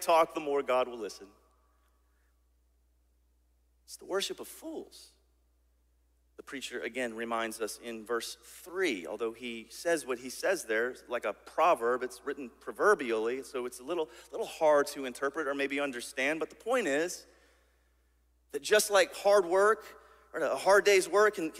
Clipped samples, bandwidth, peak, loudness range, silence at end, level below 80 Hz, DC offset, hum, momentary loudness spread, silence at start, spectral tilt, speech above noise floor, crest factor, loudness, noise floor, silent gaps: under 0.1%; 16 kHz; -12 dBFS; 13 LU; 0 s; -70 dBFS; under 0.1%; none; 17 LU; 0 s; -2.5 dB/octave; 39 dB; 20 dB; -31 LUFS; -70 dBFS; none